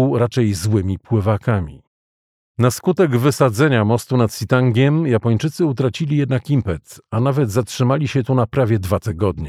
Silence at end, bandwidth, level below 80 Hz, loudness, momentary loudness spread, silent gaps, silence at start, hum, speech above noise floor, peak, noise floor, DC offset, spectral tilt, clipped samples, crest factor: 0 s; 15.5 kHz; -44 dBFS; -18 LUFS; 5 LU; 1.87-2.55 s; 0 s; none; over 73 dB; -2 dBFS; under -90 dBFS; under 0.1%; -7 dB/octave; under 0.1%; 14 dB